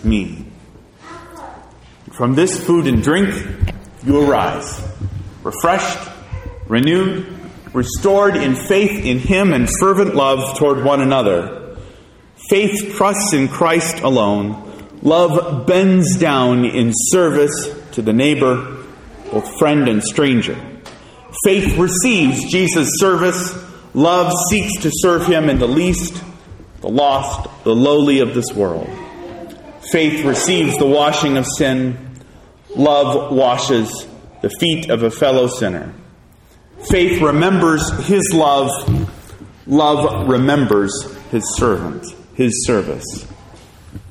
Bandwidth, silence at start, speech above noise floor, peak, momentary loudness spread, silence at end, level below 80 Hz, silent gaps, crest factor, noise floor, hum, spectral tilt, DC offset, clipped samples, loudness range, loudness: 16 kHz; 0 s; 31 dB; 0 dBFS; 17 LU; 0 s; -36 dBFS; none; 16 dB; -46 dBFS; none; -4.5 dB/octave; under 0.1%; under 0.1%; 4 LU; -15 LUFS